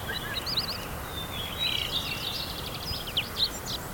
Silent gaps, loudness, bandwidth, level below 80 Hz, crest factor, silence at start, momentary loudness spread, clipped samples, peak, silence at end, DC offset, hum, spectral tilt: none; -30 LUFS; 19 kHz; -46 dBFS; 16 dB; 0 s; 7 LU; under 0.1%; -16 dBFS; 0 s; under 0.1%; none; -2.5 dB/octave